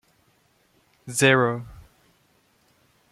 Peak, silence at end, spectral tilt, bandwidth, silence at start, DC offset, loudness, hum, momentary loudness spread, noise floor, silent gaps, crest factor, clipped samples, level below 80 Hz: -4 dBFS; 1.3 s; -4 dB/octave; 15 kHz; 1.05 s; under 0.1%; -21 LUFS; none; 27 LU; -64 dBFS; none; 22 dB; under 0.1%; -58 dBFS